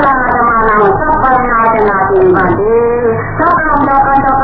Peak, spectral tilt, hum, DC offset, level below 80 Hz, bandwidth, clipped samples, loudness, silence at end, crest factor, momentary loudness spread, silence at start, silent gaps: 0 dBFS; -10.5 dB/octave; none; under 0.1%; -28 dBFS; 5.4 kHz; under 0.1%; -9 LUFS; 0 s; 8 dB; 2 LU; 0 s; none